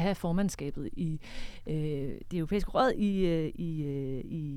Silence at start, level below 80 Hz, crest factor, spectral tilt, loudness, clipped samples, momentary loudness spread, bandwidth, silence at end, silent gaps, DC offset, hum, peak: 0 s; -44 dBFS; 18 dB; -7 dB/octave; -32 LUFS; under 0.1%; 10 LU; 15.5 kHz; 0 s; none; under 0.1%; none; -12 dBFS